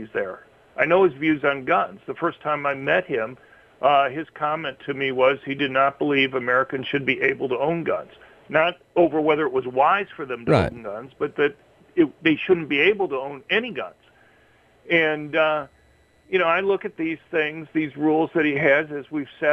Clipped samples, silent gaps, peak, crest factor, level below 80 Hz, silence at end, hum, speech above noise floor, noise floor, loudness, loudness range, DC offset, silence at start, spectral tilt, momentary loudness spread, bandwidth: under 0.1%; none; -4 dBFS; 18 dB; -56 dBFS; 0 s; none; 36 dB; -58 dBFS; -22 LUFS; 2 LU; under 0.1%; 0 s; -7 dB/octave; 10 LU; 9.2 kHz